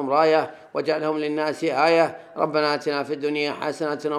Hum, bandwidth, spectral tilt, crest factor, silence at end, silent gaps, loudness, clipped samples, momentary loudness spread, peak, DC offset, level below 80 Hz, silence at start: none; 12.5 kHz; -5 dB/octave; 18 dB; 0 s; none; -23 LUFS; under 0.1%; 8 LU; -4 dBFS; under 0.1%; -78 dBFS; 0 s